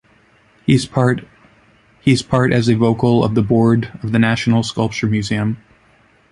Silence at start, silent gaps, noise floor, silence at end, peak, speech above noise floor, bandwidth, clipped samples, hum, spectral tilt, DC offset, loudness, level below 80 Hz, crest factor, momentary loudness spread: 0.7 s; none; -53 dBFS; 0.75 s; 0 dBFS; 38 dB; 11.5 kHz; under 0.1%; none; -6.5 dB/octave; under 0.1%; -16 LUFS; -44 dBFS; 16 dB; 6 LU